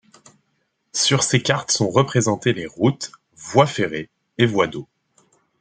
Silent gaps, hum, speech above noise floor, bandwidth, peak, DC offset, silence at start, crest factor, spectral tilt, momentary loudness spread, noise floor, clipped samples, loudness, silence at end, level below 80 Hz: none; none; 51 dB; 9.6 kHz; -2 dBFS; under 0.1%; 0.95 s; 20 dB; -4 dB/octave; 14 LU; -70 dBFS; under 0.1%; -20 LUFS; 0.75 s; -60 dBFS